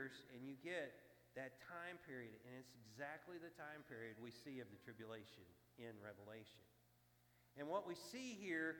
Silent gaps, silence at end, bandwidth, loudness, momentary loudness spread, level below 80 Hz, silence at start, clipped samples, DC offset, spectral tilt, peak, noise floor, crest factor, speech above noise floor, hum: none; 0 s; 19 kHz; -54 LUFS; 14 LU; -88 dBFS; 0 s; under 0.1%; under 0.1%; -4.5 dB/octave; -32 dBFS; -76 dBFS; 22 dB; 23 dB; 60 Hz at -80 dBFS